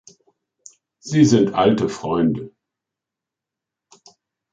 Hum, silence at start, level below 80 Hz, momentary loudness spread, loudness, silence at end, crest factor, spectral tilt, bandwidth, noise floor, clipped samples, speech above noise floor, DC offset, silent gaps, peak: none; 1.05 s; -54 dBFS; 18 LU; -18 LUFS; 2.05 s; 20 dB; -6.5 dB/octave; 9 kHz; -86 dBFS; under 0.1%; 69 dB; under 0.1%; none; -2 dBFS